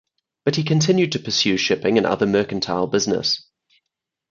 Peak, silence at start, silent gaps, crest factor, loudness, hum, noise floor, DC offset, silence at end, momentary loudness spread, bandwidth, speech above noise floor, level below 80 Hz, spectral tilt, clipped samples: -4 dBFS; 0.45 s; none; 18 dB; -20 LUFS; none; -82 dBFS; under 0.1%; 0.9 s; 5 LU; 7.6 kHz; 63 dB; -56 dBFS; -4.5 dB/octave; under 0.1%